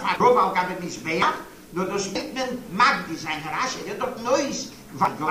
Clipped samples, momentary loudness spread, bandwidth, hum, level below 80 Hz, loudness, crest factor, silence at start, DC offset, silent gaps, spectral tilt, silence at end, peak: under 0.1%; 11 LU; 15.5 kHz; none; -56 dBFS; -24 LUFS; 20 dB; 0 s; 0.1%; none; -3.5 dB/octave; 0 s; -4 dBFS